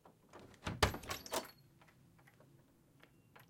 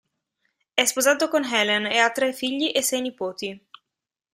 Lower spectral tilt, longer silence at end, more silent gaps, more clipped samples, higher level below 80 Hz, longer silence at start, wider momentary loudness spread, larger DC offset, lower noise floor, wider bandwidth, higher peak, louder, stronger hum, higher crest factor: first, -3.5 dB/octave vs -1 dB/octave; second, 0.05 s vs 0.75 s; neither; neither; first, -56 dBFS vs -70 dBFS; second, 0.05 s vs 0.75 s; first, 26 LU vs 11 LU; neither; second, -68 dBFS vs -86 dBFS; about the same, 16.5 kHz vs 16 kHz; second, -14 dBFS vs -2 dBFS; second, -40 LUFS vs -22 LUFS; neither; first, 32 dB vs 24 dB